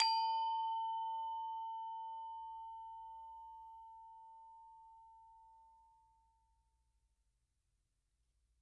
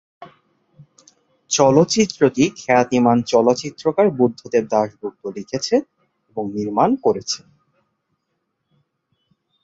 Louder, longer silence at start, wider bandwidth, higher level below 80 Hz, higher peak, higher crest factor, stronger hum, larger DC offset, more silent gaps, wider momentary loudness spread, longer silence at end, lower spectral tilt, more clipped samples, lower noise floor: second, -42 LUFS vs -18 LUFS; second, 0 s vs 0.2 s; first, 9 kHz vs 8 kHz; second, -80 dBFS vs -60 dBFS; second, -16 dBFS vs -2 dBFS; first, 28 dB vs 18 dB; neither; neither; neither; first, 24 LU vs 12 LU; first, 2.85 s vs 2.25 s; second, 1.5 dB/octave vs -5 dB/octave; neither; first, -84 dBFS vs -74 dBFS